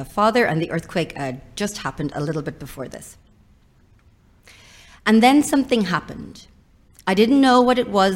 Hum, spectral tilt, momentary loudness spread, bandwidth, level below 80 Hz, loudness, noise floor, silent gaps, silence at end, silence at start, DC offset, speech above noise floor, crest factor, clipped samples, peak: none; -5 dB/octave; 20 LU; 16.5 kHz; -50 dBFS; -19 LUFS; -54 dBFS; none; 0 s; 0 s; under 0.1%; 35 dB; 20 dB; under 0.1%; -2 dBFS